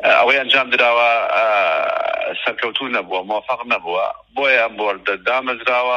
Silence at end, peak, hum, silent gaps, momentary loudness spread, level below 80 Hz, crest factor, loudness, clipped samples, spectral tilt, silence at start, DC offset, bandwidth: 0 s; -2 dBFS; none; none; 9 LU; -62 dBFS; 16 dB; -17 LUFS; under 0.1%; -3 dB/octave; 0 s; under 0.1%; 10.5 kHz